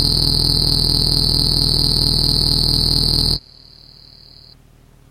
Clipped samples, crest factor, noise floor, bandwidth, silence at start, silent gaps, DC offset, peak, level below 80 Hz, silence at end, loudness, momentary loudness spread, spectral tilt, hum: under 0.1%; 18 dB; -48 dBFS; 15.5 kHz; 0 s; none; under 0.1%; 0 dBFS; -26 dBFS; 1.7 s; -14 LUFS; 1 LU; -4 dB/octave; none